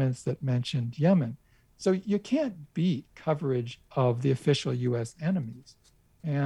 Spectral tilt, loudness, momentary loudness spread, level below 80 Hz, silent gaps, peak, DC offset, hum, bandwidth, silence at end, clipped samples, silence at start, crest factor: -7 dB/octave; -29 LUFS; 8 LU; -64 dBFS; none; -12 dBFS; under 0.1%; none; 11.5 kHz; 0 s; under 0.1%; 0 s; 18 dB